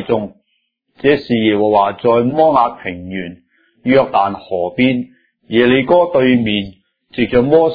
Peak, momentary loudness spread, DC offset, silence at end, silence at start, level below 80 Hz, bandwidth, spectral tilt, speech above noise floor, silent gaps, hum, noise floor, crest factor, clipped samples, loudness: 0 dBFS; 14 LU; under 0.1%; 0 s; 0 s; -46 dBFS; 5 kHz; -9.5 dB/octave; 53 dB; none; none; -66 dBFS; 14 dB; under 0.1%; -14 LUFS